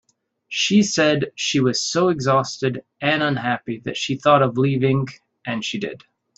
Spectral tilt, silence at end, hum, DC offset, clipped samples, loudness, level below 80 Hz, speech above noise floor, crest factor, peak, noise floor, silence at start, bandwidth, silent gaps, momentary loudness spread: -4.5 dB/octave; 0.4 s; none; under 0.1%; under 0.1%; -20 LUFS; -60 dBFS; 26 dB; 18 dB; -2 dBFS; -46 dBFS; 0.5 s; 8.2 kHz; none; 12 LU